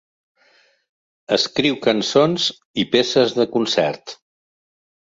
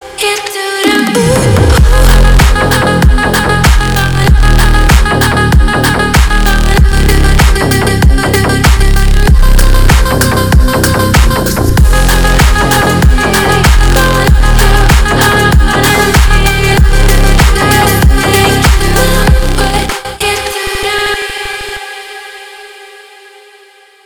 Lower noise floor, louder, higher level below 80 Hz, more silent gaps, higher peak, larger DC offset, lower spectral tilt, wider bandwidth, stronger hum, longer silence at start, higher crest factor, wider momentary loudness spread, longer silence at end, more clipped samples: first, -58 dBFS vs -40 dBFS; second, -18 LUFS vs -8 LUFS; second, -62 dBFS vs -10 dBFS; first, 2.65-2.74 s vs none; about the same, -2 dBFS vs 0 dBFS; neither; about the same, -4 dB/octave vs -4.5 dB/octave; second, 7.8 kHz vs over 20 kHz; neither; first, 1.3 s vs 0 s; first, 18 dB vs 6 dB; about the same, 7 LU vs 6 LU; second, 0.9 s vs 1.2 s; second, under 0.1% vs 4%